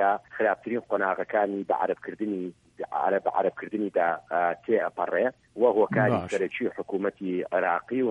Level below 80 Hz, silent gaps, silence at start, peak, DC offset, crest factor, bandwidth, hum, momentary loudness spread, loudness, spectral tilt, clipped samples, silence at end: -68 dBFS; none; 0 s; -10 dBFS; under 0.1%; 16 dB; 9.6 kHz; none; 8 LU; -27 LUFS; -7.5 dB/octave; under 0.1%; 0 s